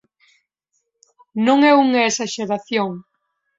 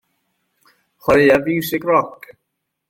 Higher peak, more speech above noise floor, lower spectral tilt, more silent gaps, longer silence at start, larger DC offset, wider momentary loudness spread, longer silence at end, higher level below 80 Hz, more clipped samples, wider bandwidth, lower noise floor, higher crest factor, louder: about the same, -2 dBFS vs -2 dBFS; second, 56 dB vs 60 dB; second, -3.5 dB/octave vs -5.5 dB/octave; neither; first, 1.35 s vs 1.05 s; neither; first, 14 LU vs 11 LU; second, 0.55 s vs 0.8 s; second, -68 dBFS vs -50 dBFS; neither; second, 7.8 kHz vs 16.5 kHz; second, -72 dBFS vs -76 dBFS; about the same, 18 dB vs 18 dB; about the same, -17 LUFS vs -16 LUFS